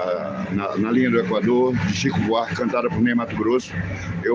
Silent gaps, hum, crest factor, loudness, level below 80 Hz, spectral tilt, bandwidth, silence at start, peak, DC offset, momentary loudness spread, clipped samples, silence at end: none; none; 14 dB; -21 LUFS; -50 dBFS; -6.5 dB/octave; 7.6 kHz; 0 s; -8 dBFS; under 0.1%; 7 LU; under 0.1%; 0 s